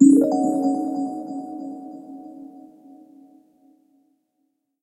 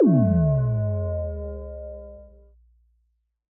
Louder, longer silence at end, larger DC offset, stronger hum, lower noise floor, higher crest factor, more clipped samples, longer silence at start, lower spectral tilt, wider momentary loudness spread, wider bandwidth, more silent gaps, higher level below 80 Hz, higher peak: about the same, -22 LUFS vs -23 LUFS; first, 2.25 s vs 1.25 s; neither; neither; about the same, -73 dBFS vs -71 dBFS; first, 22 dB vs 16 dB; neither; about the same, 0 s vs 0 s; second, -7.5 dB/octave vs -14.5 dB/octave; first, 23 LU vs 20 LU; first, 12 kHz vs 2.3 kHz; neither; second, -72 dBFS vs -40 dBFS; first, -2 dBFS vs -8 dBFS